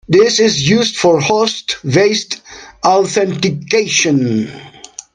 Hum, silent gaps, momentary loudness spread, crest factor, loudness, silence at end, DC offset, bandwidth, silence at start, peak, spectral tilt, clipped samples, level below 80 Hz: none; none; 14 LU; 14 dB; -13 LUFS; 0.45 s; under 0.1%; 10.5 kHz; 0.1 s; 0 dBFS; -4 dB/octave; under 0.1%; -50 dBFS